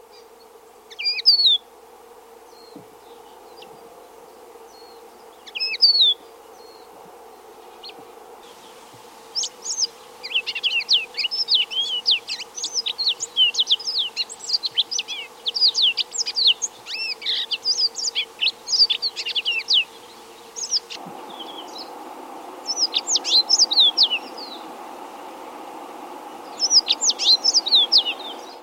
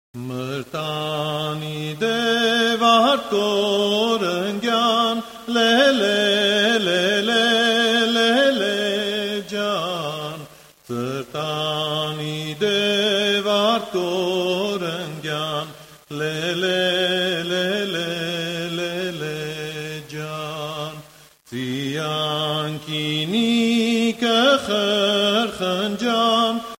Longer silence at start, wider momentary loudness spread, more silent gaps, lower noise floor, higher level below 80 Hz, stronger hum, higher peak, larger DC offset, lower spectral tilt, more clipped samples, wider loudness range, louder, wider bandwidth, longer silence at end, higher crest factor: about the same, 0.15 s vs 0.15 s; first, 23 LU vs 12 LU; neither; about the same, -47 dBFS vs -48 dBFS; second, -74 dBFS vs -60 dBFS; neither; about the same, -4 dBFS vs -4 dBFS; neither; second, 2.5 dB/octave vs -4 dB/octave; neither; about the same, 7 LU vs 8 LU; about the same, -18 LUFS vs -20 LUFS; about the same, 16 kHz vs 16.5 kHz; about the same, 0 s vs 0.05 s; about the same, 18 dB vs 18 dB